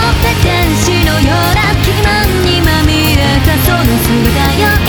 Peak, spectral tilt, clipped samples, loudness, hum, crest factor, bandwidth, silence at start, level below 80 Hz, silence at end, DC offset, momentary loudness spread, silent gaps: 0 dBFS; -5 dB/octave; under 0.1%; -10 LUFS; none; 10 dB; over 20 kHz; 0 s; -16 dBFS; 0 s; under 0.1%; 1 LU; none